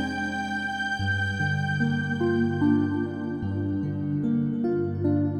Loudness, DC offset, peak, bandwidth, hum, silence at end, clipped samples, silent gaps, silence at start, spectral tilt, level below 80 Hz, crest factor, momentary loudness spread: -26 LUFS; under 0.1%; -12 dBFS; 10 kHz; none; 0 s; under 0.1%; none; 0 s; -7 dB/octave; -56 dBFS; 14 dB; 5 LU